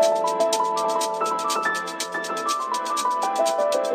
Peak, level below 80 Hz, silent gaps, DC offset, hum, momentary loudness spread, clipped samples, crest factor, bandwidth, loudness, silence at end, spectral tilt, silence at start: -8 dBFS; -84 dBFS; none; under 0.1%; none; 5 LU; under 0.1%; 16 dB; 15.5 kHz; -23 LUFS; 0 s; -1.5 dB/octave; 0 s